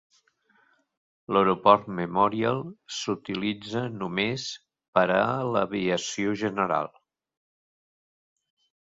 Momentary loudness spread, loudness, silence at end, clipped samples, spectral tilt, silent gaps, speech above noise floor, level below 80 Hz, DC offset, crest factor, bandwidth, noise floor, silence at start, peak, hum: 12 LU; -26 LUFS; 2.05 s; under 0.1%; -5 dB/octave; 4.88-4.93 s; 40 dB; -64 dBFS; under 0.1%; 24 dB; 7.8 kHz; -66 dBFS; 1.3 s; -4 dBFS; none